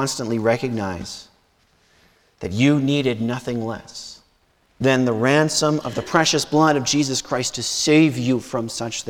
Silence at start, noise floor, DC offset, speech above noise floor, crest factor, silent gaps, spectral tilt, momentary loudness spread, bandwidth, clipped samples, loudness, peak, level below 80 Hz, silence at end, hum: 0 s; -61 dBFS; under 0.1%; 41 dB; 18 dB; none; -4.5 dB/octave; 14 LU; 17 kHz; under 0.1%; -20 LUFS; -2 dBFS; -54 dBFS; 0 s; none